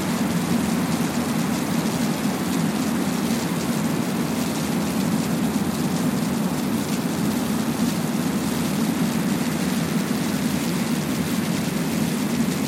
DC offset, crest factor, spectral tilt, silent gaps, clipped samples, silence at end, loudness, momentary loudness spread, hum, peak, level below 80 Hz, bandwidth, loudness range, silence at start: under 0.1%; 12 dB; -5 dB/octave; none; under 0.1%; 0 s; -23 LUFS; 1 LU; none; -10 dBFS; -50 dBFS; 16.5 kHz; 0 LU; 0 s